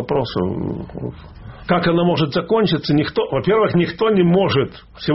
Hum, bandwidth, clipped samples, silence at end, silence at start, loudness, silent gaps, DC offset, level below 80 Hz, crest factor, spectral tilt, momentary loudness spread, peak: none; 6 kHz; under 0.1%; 0 s; 0 s; -18 LUFS; none; under 0.1%; -44 dBFS; 16 dB; -5.5 dB/octave; 15 LU; -2 dBFS